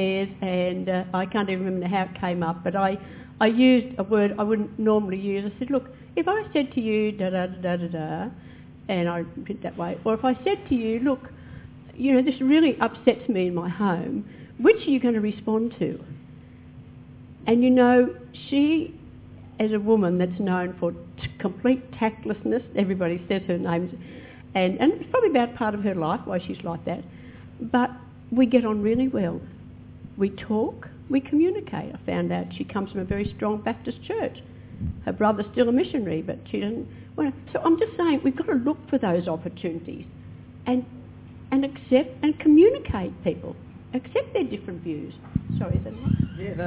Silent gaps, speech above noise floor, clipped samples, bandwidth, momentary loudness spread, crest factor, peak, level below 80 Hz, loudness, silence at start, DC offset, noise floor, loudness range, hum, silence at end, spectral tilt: none; 21 dB; under 0.1%; 4 kHz; 16 LU; 20 dB; -4 dBFS; -48 dBFS; -25 LUFS; 0 s; under 0.1%; -45 dBFS; 5 LU; 50 Hz at -50 dBFS; 0 s; -11 dB/octave